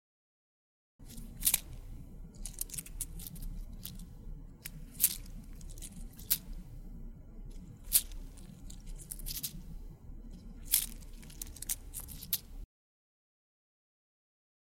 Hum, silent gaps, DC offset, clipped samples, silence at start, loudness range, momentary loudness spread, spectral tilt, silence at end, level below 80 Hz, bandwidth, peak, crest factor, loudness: none; none; under 0.1%; under 0.1%; 1 s; 6 LU; 22 LU; -1 dB/octave; 2 s; -48 dBFS; 17 kHz; -8 dBFS; 34 dB; -35 LUFS